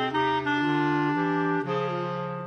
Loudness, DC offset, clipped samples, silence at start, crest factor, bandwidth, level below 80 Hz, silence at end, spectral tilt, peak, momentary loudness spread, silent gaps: -26 LUFS; under 0.1%; under 0.1%; 0 s; 12 dB; 6.8 kHz; -64 dBFS; 0 s; -7 dB/octave; -14 dBFS; 5 LU; none